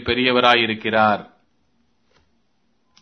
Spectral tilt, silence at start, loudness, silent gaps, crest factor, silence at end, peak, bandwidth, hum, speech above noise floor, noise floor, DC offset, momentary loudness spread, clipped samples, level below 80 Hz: -5.5 dB/octave; 0 s; -17 LUFS; none; 22 dB; 1.75 s; 0 dBFS; 6.6 kHz; none; 51 dB; -68 dBFS; under 0.1%; 5 LU; under 0.1%; -52 dBFS